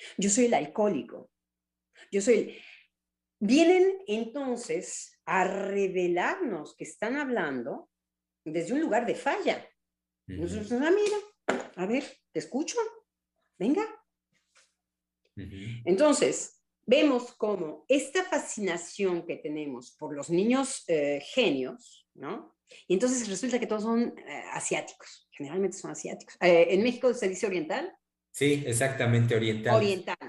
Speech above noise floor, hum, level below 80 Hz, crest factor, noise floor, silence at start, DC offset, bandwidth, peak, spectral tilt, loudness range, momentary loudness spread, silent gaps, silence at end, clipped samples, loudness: 60 dB; none; -68 dBFS; 20 dB; -88 dBFS; 0 s; under 0.1%; 12 kHz; -10 dBFS; -4.5 dB/octave; 5 LU; 16 LU; none; 0 s; under 0.1%; -28 LUFS